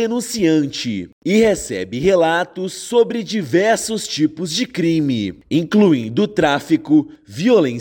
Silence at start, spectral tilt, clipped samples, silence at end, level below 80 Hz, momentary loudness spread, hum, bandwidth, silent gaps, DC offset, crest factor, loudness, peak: 0 s; -5 dB/octave; under 0.1%; 0 s; -50 dBFS; 8 LU; none; 17 kHz; 1.12-1.22 s; under 0.1%; 14 dB; -17 LUFS; -4 dBFS